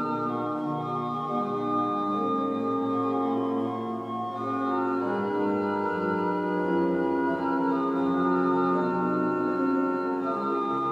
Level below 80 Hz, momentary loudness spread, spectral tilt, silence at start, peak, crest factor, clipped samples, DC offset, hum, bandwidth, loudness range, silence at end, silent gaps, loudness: -68 dBFS; 5 LU; -8.5 dB/octave; 0 s; -14 dBFS; 14 dB; under 0.1%; under 0.1%; none; 7.2 kHz; 2 LU; 0 s; none; -27 LUFS